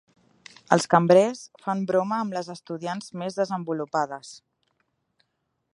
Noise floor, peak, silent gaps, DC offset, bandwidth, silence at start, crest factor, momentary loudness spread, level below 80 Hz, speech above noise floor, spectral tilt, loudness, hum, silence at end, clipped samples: -77 dBFS; 0 dBFS; none; under 0.1%; 11.5 kHz; 0.7 s; 26 dB; 15 LU; -74 dBFS; 53 dB; -5.5 dB/octave; -25 LUFS; none; 1.4 s; under 0.1%